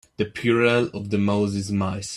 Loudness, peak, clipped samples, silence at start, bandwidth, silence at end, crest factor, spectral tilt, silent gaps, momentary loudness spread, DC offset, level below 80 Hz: -22 LUFS; -6 dBFS; under 0.1%; 0.2 s; 12 kHz; 0 s; 18 dB; -6 dB/octave; none; 7 LU; under 0.1%; -56 dBFS